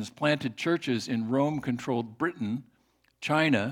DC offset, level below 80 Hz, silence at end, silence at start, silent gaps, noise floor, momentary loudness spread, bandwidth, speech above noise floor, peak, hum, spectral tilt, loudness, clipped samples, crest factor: under 0.1%; -70 dBFS; 0 s; 0 s; none; -68 dBFS; 9 LU; 15.5 kHz; 40 dB; -10 dBFS; none; -6 dB/octave; -29 LUFS; under 0.1%; 20 dB